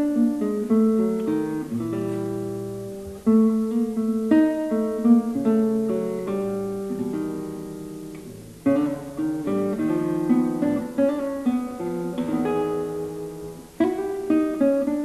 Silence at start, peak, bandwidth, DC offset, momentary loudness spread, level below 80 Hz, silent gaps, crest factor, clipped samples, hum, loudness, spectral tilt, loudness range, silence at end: 0 s; -6 dBFS; 13.5 kHz; under 0.1%; 14 LU; -56 dBFS; none; 16 dB; under 0.1%; none; -24 LUFS; -8 dB/octave; 6 LU; 0 s